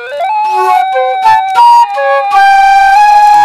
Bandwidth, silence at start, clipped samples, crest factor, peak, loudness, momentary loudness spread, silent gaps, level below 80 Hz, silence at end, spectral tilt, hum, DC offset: 15 kHz; 0 s; 4%; 6 dB; 0 dBFS; -6 LUFS; 7 LU; none; -44 dBFS; 0 s; -1.5 dB/octave; none; under 0.1%